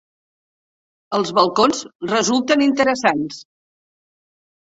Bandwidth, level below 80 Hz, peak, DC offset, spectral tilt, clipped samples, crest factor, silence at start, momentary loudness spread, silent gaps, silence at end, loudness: 8 kHz; -62 dBFS; -2 dBFS; under 0.1%; -3.5 dB/octave; under 0.1%; 18 dB; 1.1 s; 10 LU; 1.95-1.99 s; 1.25 s; -18 LUFS